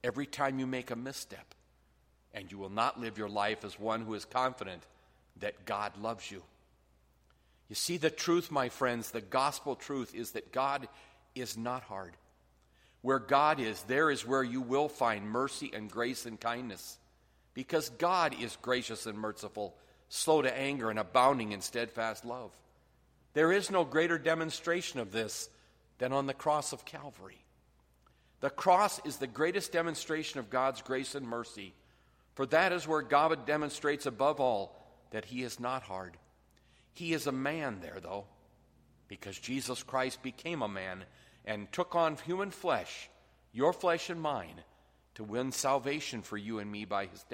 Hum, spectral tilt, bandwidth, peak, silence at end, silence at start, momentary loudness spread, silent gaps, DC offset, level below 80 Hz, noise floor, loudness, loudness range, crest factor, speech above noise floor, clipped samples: none; -4 dB/octave; 16 kHz; -12 dBFS; 0 s; 0.05 s; 16 LU; none; under 0.1%; -70 dBFS; -69 dBFS; -34 LUFS; 7 LU; 22 dB; 35 dB; under 0.1%